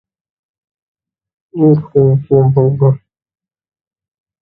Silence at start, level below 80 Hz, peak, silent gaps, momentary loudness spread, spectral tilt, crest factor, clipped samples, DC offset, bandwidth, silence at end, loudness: 1.55 s; -50 dBFS; 0 dBFS; none; 6 LU; -14.5 dB/octave; 14 dB; under 0.1%; under 0.1%; 2.1 kHz; 1.45 s; -12 LUFS